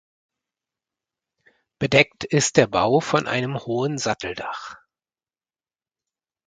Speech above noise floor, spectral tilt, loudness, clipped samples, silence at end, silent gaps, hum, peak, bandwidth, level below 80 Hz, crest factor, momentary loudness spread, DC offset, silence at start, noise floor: over 69 dB; -4 dB/octave; -21 LUFS; under 0.1%; 1.7 s; none; none; 0 dBFS; 9.6 kHz; -56 dBFS; 24 dB; 13 LU; under 0.1%; 1.8 s; under -90 dBFS